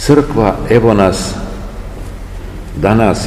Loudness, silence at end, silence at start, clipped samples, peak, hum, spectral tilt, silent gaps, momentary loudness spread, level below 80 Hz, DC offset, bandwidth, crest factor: -12 LUFS; 0 s; 0 s; 1%; 0 dBFS; none; -6.5 dB/octave; none; 18 LU; -26 dBFS; 0.4%; 15.5 kHz; 12 dB